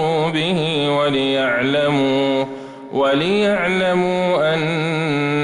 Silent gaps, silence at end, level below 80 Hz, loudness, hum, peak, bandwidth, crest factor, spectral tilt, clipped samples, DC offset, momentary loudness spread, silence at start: none; 0 s; -54 dBFS; -18 LUFS; none; -8 dBFS; 11 kHz; 10 dB; -6 dB/octave; under 0.1%; under 0.1%; 3 LU; 0 s